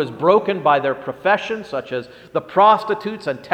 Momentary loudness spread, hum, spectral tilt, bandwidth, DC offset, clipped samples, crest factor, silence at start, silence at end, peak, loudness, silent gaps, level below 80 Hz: 13 LU; none; -6 dB/octave; 9.8 kHz; under 0.1%; under 0.1%; 18 dB; 0 s; 0 s; 0 dBFS; -19 LUFS; none; -62 dBFS